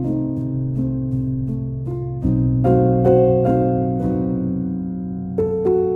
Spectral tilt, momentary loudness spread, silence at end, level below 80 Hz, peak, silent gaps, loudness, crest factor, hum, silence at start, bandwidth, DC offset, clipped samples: -12 dB/octave; 11 LU; 0 s; -36 dBFS; -2 dBFS; none; -20 LUFS; 16 dB; none; 0 s; 3 kHz; under 0.1%; under 0.1%